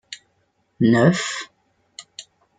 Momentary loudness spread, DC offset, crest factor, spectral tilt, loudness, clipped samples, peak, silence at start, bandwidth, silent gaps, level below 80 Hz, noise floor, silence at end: 25 LU; under 0.1%; 20 dB; -5.5 dB/octave; -19 LUFS; under 0.1%; -2 dBFS; 0.1 s; 9.4 kHz; none; -62 dBFS; -67 dBFS; 0.4 s